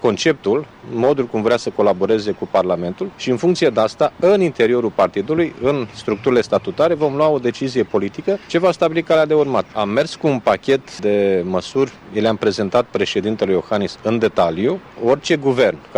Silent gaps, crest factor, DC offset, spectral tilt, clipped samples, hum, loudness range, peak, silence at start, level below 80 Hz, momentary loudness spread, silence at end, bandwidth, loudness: none; 14 dB; under 0.1%; -6 dB/octave; under 0.1%; none; 1 LU; -4 dBFS; 0 s; -54 dBFS; 5 LU; 0 s; 10.5 kHz; -18 LUFS